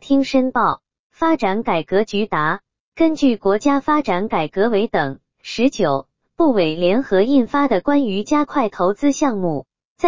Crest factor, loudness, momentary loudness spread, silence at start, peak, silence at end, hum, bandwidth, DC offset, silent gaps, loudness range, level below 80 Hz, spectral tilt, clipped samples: 14 dB; -18 LUFS; 6 LU; 0 s; -4 dBFS; 0 s; none; 7.6 kHz; 2%; 0.99-1.10 s, 2.80-2.92 s, 9.85-9.96 s; 2 LU; -52 dBFS; -5.5 dB/octave; under 0.1%